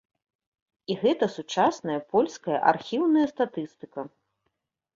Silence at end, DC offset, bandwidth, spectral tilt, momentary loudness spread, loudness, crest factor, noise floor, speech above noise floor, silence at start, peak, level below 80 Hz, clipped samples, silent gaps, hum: 0.9 s; under 0.1%; 7.6 kHz; -5.5 dB/octave; 15 LU; -25 LUFS; 20 dB; -79 dBFS; 54 dB; 0.9 s; -6 dBFS; -72 dBFS; under 0.1%; none; none